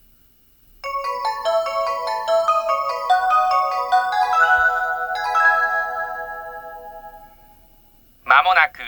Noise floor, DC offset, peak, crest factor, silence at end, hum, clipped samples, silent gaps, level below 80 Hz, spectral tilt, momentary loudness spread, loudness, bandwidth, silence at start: -54 dBFS; under 0.1%; 0 dBFS; 20 dB; 0 s; none; under 0.1%; none; -54 dBFS; -1 dB/octave; 18 LU; -18 LUFS; over 20 kHz; 0.85 s